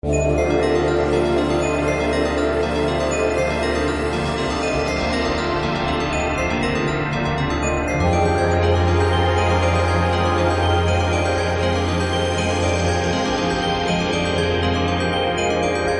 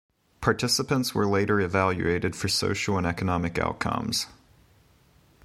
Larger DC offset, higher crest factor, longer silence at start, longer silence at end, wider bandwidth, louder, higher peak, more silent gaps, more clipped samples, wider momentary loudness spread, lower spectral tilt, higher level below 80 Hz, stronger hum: neither; second, 14 dB vs 22 dB; second, 0.05 s vs 0.4 s; second, 0 s vs 1.1 s; second, 11.5 kHz vs 15 kHz; first, -19 LUFS vs -26 LUFS; about the same, -6 dBFS vs -6 dBFS; neither; neither; about the same, 3 LU vs 5 LU; about the same, -5.5 dB/octave vs -4.5 dB/octave; first, -34 dBFS vs -48 dBFS; neither